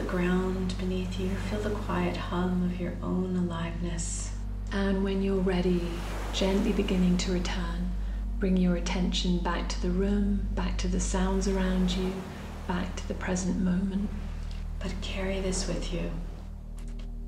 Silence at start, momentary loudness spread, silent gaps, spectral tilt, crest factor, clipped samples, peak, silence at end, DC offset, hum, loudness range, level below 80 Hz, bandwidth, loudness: 0 s; 10 LU; none; -5.5 dB/octave; 14 dB; under 0.1%; -14 dBFS; 0 s; under 0.1%; none; 4 LU; -34 dBFS; 12.5 kHz; -30 LUFS